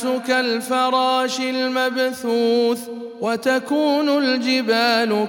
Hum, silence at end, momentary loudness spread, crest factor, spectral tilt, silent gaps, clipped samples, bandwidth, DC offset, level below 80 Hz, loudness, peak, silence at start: none; 0 s; 5 LU; 14 dB; -3.5 dB/octave; none; under 0.1%; 17.5 kHz; under 0.1%; -74 dBFS; -19 LUFS; -4 dBFS; 0 s